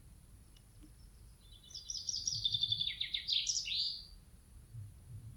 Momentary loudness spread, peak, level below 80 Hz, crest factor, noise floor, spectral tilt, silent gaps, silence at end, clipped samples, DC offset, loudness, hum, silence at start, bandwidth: 20 LU; -20 dBFS; -60 dBFS; 22 dB; -59 dBFS; 0.5 dB/octave; none; 0 s; under 0.1%; under 0.1%; -35 LUFS; none; 0 s; 19.5 kHz